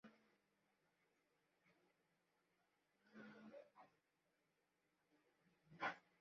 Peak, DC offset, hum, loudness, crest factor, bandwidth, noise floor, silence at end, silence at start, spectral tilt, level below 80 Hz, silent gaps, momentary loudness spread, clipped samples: -34 dBFS; under 0.1%; none; -54 LUFS; 28 dB; 6.6 kHz; -87 dBFS; 0.2 s; 0.05 s; -2 dB/octave; under -90 dBFS; none; 18 LU; under 0.1%